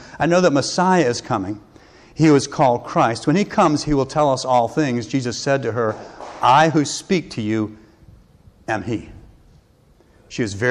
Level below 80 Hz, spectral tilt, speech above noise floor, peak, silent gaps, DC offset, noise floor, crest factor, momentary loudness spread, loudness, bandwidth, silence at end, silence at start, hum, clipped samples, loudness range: -48 dBFS; -5.5 dB/octave; 36 dB; -6 dBFS; none; under 0.1%; -54 dBFS; 14 dB; 13 LU; -19 LUFS; 11 kHz; 0 s; 0 s; none; under 0.1%; 9 LU